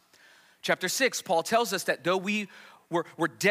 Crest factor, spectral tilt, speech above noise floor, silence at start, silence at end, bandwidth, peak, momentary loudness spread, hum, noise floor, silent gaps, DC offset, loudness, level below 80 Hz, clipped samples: 18 dB; -3 dB/octave; 30 dB; 0.65 s; 0 s; 16 kHz; -10 dBFS; 7 LU; none; -58 dBFS; none; under 0.1%; -28 LUFS; -80 dBFS; under 0.1%